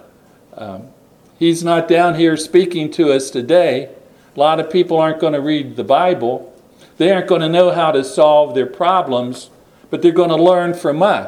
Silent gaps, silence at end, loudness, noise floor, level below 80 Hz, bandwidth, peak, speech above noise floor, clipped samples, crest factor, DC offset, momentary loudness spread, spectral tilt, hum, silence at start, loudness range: none; 0 s; -14 LUFS; -47 dBFS; -62 dBFS; 12.5 kHz; 0 dBFS; 34 dB; under 0.1%; 14 dB; under 0.1%; 14 LU; -5.5 dB/octave; none; 0.55 s; 2 LU